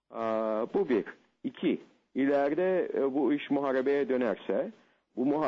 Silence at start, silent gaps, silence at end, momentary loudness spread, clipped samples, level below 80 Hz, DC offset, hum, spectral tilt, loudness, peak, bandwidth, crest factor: 0.1 s; none; 0 s; 12 LU; under 0.1%; -76 dBFS; under 0.1%; none; -8 dB/octave; -30 LUFS; -18 dBFS; 6.4 kHz; 12 dB